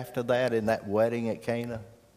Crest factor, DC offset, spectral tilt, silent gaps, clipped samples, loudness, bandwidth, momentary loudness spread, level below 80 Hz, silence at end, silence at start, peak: 16 dB; under 0.1%; -6.5 dB/octave; none; under 0.1%; -29 LUFS; 15.5 kHz; 8 LU; -62 dBFS; 0.25 s; 0 s; -12 dBFS